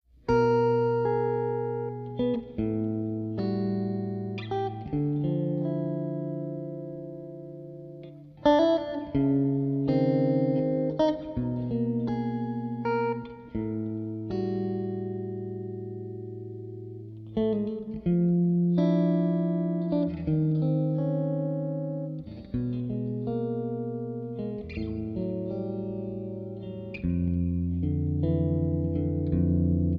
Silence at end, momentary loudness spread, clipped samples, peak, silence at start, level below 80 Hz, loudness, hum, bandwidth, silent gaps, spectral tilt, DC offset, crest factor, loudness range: 0 s; 13 LU; under 0.1%; -10 dBFS; 0.25 s; -48 dBFS; -29 LUFS; none; 6 kHz; none; -10 dB/octave; under 0.1%; 18 dB; 7 LU